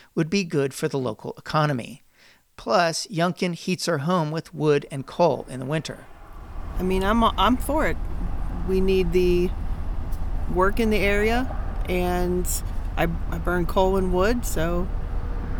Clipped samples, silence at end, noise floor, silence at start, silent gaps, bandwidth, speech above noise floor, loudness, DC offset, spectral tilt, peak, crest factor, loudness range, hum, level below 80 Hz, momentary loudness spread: under 0.1%; 0 s; -56 dBFS; 0.15 s; none; 19.5 kHz; 34 dB; -24 LUFS; under 0.1%; -5.5 dB/octave; -6 dBFS; 16 dB; 2 LU; none; -30 dBFS; 12 LU